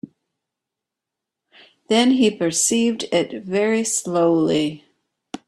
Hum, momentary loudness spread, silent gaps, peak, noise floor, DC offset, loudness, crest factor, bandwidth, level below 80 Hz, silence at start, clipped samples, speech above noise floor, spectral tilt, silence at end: none; 6 LU; none; -4 dBFS; -85 dBFS; under 0.1%; -19 LUFS; 16 dB; 13.5 kHz; -64 dBFS; 1.9 s; under 0.1%; 66 dB; -3.5 dB/octave; 0.1 s